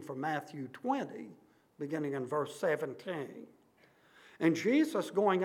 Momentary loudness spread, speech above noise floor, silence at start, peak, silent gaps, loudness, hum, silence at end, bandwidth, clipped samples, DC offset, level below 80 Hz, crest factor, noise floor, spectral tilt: 16 LU; 32 dB; 0 s; -16 dBFS; none; -34 LUFS; none; 0 s; 15.5 kHz; under 0.1%; under 0.1%; -88 dBFS; 18 dB; -66 dBFS; -6 dB/octave